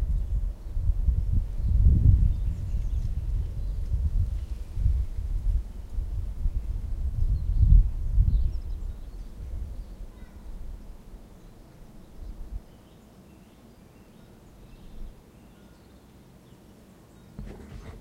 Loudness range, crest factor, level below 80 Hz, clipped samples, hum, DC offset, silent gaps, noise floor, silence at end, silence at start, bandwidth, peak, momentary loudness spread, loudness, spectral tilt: 24 LU; 20 dB; -28 dBFS; under 0.1%; none; under 0.1%; none; -52 dBFS; 0 s; 0 s; 4.3 kHz; -6 dBFS; 25 LU; -29 LUFS; -9 dB/octave